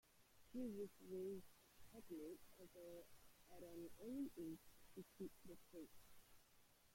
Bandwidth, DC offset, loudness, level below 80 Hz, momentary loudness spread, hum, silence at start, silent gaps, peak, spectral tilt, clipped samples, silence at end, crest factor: 16.5 kHz; under 0.1%; -57 LUFS; -78 dBFS; 13 LU; none; 0.05 s; none; -40 dBFS; -6 dB/octave; under 0.1%; 0 s; 16 dB